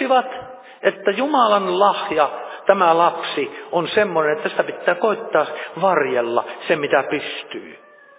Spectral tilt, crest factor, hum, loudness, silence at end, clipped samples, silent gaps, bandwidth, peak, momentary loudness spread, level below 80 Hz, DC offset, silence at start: -8.5 dB/octave; 18 dB; none; -19 LUFS; 0.4 s; under 0.1%; none; 4 kHz; 0 dBFS; 10 LU; -68 dBFS; under 0.1%; 0 s